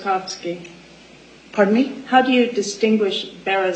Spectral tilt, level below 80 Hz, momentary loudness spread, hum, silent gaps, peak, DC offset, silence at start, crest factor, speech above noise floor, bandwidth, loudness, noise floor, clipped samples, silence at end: -4.5 dB/octave; -62 dBFS; 13 LU; none; none; -2 dBFS; under 0.1%; 0 s; 18 dB; 26 dB; 9.2 kHz; -19 LUFS; -45 dBFS; under 0.1%; 0 s